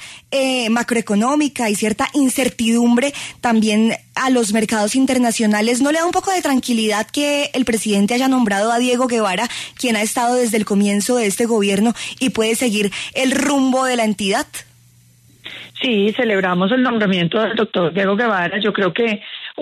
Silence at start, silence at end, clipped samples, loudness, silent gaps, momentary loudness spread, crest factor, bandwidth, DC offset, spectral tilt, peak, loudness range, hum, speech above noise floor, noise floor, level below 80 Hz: 0 s; 0 s; under 0.1%; -17 LUFS; none; 5 LU; 12 dB; 13.5 kHz; under 0.1%; -4 dB/octave; -4 dBFS; 2 LU; none; 33 dB; -50 dBFS; -56 dBFS